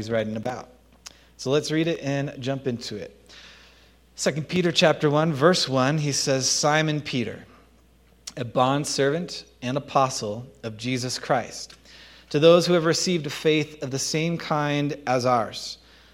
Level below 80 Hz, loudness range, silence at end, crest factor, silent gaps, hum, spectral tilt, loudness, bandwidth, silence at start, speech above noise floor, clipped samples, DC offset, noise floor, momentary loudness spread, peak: -58 dBFS; 7 LU; 0.4 s; 22 dB; none; none; -4.5 dB/octave; -23 LUFS; 16 kHz; 0 s; 33 dB; under 0.1%; under 0.1%; -57 dBFS; 15 LU; -4 dBFS